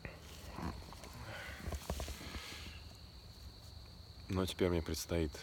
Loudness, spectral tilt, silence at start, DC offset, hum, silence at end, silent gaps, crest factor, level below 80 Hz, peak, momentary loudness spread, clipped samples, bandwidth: -42 LUFS; -5 dB/octave; 0 s; under 0.1%; none; 0 s; none; 22 dB; -52 dBFS; -20 dBFS; 18 LU; under 0.1%; 19 kHz